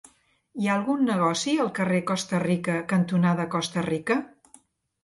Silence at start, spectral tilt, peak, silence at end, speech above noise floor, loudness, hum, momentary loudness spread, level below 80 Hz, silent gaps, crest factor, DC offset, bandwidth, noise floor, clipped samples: 0.55 s; -5.5 dB/octave; -10 dBFS; 0.75 s; 33 dB; -25 LUFS; none; 5 LU; -66 dBFS; none; 16 dB; under 0.1%; 11.5 kHz; -58 dBFS; under 0.1%